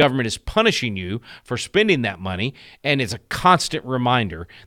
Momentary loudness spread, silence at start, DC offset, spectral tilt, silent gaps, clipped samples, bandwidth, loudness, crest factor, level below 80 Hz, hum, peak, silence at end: 11 LU; 0 s; under 0.1%; -4.5 dB/octave; none; under 0.1%; 17 kHz; -21 LUFS; 18 dB; -44 dBFS; none; -2 dBFS; 0.1 s